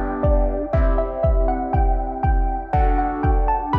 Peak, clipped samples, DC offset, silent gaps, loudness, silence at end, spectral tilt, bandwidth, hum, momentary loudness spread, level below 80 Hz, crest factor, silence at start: -8 dBFS; under 0.1%; under 0.1%; none; -21 LUFS; 0 s; -10.5 dB/octave; 3.2 kHz; none; 2 LU; -20 dBFS; 12 dB; 0 s